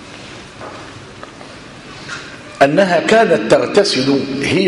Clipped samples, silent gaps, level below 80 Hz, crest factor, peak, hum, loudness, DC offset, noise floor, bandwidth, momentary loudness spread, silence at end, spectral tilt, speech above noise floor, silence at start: under 0.1%; none; -50 dBFS; 16 dB; 0 dBFS; none; -13 LUFS; under 0.1%; -35 dBFS; 11.5 kHz; 22 LU; 0 s; -4.5 dB/octave; 22 dB; 0 s